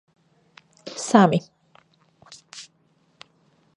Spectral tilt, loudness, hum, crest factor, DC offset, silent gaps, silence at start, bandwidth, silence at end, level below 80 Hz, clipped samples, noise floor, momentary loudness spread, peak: -5.5 dB/octave; -20 LUFS; none; 24 dB; under 0.1%; none; 0.85 s; 11 kHz; 1.15 s; -70 dBFS; under 0.1%; -64 dBFS; 25 LU; -2 dBFS